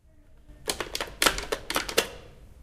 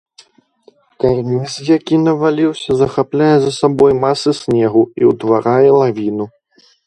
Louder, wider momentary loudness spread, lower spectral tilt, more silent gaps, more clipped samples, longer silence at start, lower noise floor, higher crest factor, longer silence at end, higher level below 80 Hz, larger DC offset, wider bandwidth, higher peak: second, -28 LUFS vs -14 LUFS; first, 11 LU vs 8 LU; second, -1 dB/octave vs -6.5 dB/octave; neither; neither; second, 0.2 s vs 1 s; about the same, -53 dBFS vs -50 dBFS; first, 30 dB vs 14 dB; second, 0 s vs 0.6 s; about the same, -46 dBFS vs -48 dBFS; neither; first, 16 kHz vs 11 kHz; about the same, -2 dBFS vs 0 dBFS